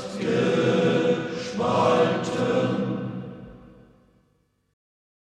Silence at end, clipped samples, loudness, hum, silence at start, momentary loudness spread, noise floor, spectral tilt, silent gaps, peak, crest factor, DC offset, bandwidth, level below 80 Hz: 1.65 s; under 0.1%; -23 LUFS; none; 0 s; 13 LU; -67 dBFS; -6 dB/octave; none; -8 dBFS; 18 dB; under 0.1%; 10 kHz; -60 dBFS